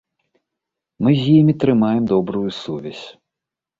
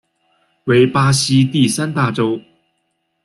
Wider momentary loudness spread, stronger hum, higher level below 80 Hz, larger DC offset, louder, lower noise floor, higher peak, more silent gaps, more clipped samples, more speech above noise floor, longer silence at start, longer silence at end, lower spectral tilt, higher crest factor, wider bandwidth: first, 18 LU vs 8 LU; neither; about the same, -54 dBFS vs -52 dBFS; neither; about the same, -17 LUFS vs -15 LUFS; first, -85 dBFS vs -69 dBFS; about the same, -2 dBFS vs -2 dBFS; neither; neither; first, 69 dB vs 55 dB; first, 1 s vs 0.65 s; second, 0.7 s vs 0.85 s; first, -8.5 dB/octave vs -5 dB/octave; about the same, 16 dB vs 16 dB; second, 7.6 kHz vs 12.5 kHz